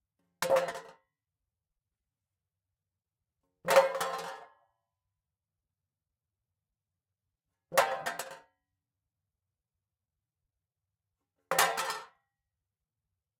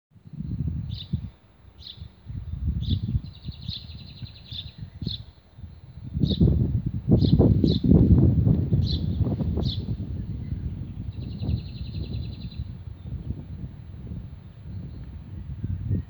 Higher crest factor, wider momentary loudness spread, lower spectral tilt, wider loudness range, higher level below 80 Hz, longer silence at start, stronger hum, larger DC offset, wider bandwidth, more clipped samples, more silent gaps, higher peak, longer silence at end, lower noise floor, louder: first, 28 dB vs 22 dB; second, 18 LU vs 22 LU; second, -1.5 dB/octave vs -10 dB/octave; second, 8 LU vs 15 LU; second, -80 dBFS vs -34 dBFS; first, 0.4 s vs 0.25 s; neither; neither; second, 16 kHz vs over 20 kHz; neither; neither; second, -8 dBFS vs -4 dBFS; first, 1.35 s vs 0 s; first, under -90 dBFS vs -52 dBFS; second, -30 LUFS vs -26 LUFS